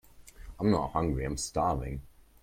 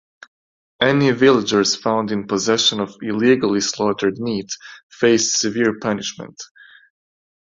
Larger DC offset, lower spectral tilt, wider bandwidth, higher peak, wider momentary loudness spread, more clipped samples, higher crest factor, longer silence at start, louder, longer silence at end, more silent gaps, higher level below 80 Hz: neither; first, -6 dB/octave vs -3.5 dB/octave; first, 16.5 kHz vs 7.8 kHz; second, -12 dBFS vs -2 dBFS; about the same, 13 LU vs 14 LU; neither; about the same, 20 dB vs 18 dB; second, 0.2 s vs 0.8 s; second, -31 LUFS vs -18 LUFS; second, 0.35 s vs 1 s; second, none vs 4.83-4.90 s; first, -44 dBFS vs -58 dBFS